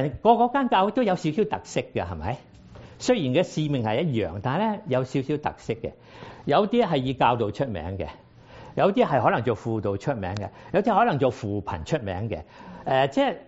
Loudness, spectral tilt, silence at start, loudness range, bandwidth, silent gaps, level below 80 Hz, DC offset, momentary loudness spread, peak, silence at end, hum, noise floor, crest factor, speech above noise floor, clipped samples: -25 LUFS; -5.5 dB/octave; 0 s; 2 LU; 8 kHz; none; -52 dBFS; under 0.1%; 12 LU; -4 dBFS; 0.05 s; none; -46 dBFS; 20 dB; 22 dB; under 0.1%